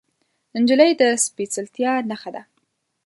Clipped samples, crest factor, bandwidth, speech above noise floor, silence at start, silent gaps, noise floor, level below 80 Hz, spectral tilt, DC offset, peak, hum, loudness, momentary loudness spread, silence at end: under 0.1%; 20 dB; 12 kHz; 52 dB; 0.55 s; none; -71 dBFS; -72 dBFS; -2.5 dB/octave; under 0.1%; 0 dBFS; none; -19 LUFS; 17 LU; 0.65 s